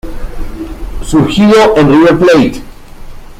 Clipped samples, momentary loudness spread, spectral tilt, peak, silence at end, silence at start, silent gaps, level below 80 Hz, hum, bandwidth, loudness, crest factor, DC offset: under 0.1%; 20 LU; -6 dB/octave; 0 dBFS; 0.05 s; 0.05 s; none; -24 dBFS; none; 15.5 kHz; -7 LUFS; 10 dB; under 0.1%